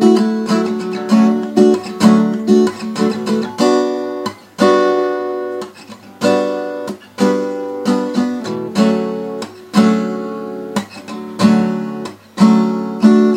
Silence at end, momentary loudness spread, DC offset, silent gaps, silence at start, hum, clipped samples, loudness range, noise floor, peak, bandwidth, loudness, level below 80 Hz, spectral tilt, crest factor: 0 s; 13 LU; under 0.1%; none; 0 s; none; under 0.1%; 5 LU; -37 dBFS; 0 dBFS; 13.5 kHz; -15 LUFS; -62 dBFS; -6.5 dB/octave; 14 dB